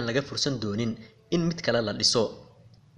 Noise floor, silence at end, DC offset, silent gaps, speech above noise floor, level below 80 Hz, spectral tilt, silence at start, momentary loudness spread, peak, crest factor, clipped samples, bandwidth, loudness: -55 dBFS; 0.55 s; under 0.1%; none; 27 dB; -56 dBFS; -4 dB/octave; 0 s; 9 LU; -8 dBFS; 20 dB; under 0.1%; 11.5 kHz; -27 LUFS